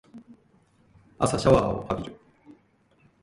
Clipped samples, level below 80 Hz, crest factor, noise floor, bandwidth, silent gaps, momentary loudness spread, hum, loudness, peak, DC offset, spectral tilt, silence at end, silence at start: under 0.1%; -46 dBFS; 24 dB; -63 dBFS; 11.5 kHz; none; 12 LU; none; -24 LUFS; -4 dBFS; under 0.1%; -6 dB/octave; 1.1 s; 0.15 s